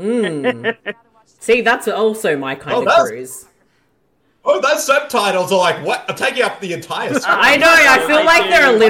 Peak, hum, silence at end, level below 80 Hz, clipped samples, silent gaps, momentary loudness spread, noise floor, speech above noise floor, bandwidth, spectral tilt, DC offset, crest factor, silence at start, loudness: -2 dBFS; none; 0 s; -50 dBFS; under 0.1%; none; 14 LU; -61 dBFS; 47 dB; 17 kHz; -3 dB/octave; under 0.1%; 14 dB; 0 s; -13 LUFS